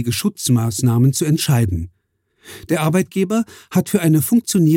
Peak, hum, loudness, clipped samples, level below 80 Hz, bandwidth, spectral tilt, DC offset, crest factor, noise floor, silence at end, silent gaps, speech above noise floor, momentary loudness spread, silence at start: -4 dBFS; none; -17 LUFS; under 0.1%; -44 dBFS; 17 kHz; -5.5 dB/octave; under 0.1%; 14 dB; -58 dBFS; 0 s; none; 42 dB; 7 LU; 0 s